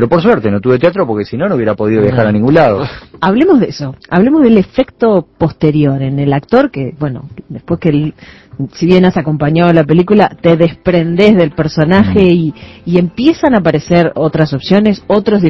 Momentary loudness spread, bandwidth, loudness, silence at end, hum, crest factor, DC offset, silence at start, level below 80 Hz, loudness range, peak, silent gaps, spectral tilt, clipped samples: 9 LU; 6.2 kHz; -11 LUFS; 0 s; none; 10 dB; under 0.1%; 0 s; -38 dBFS; 4 LU; 0 dBFS; none; -8.5 dB/octave; 0.7%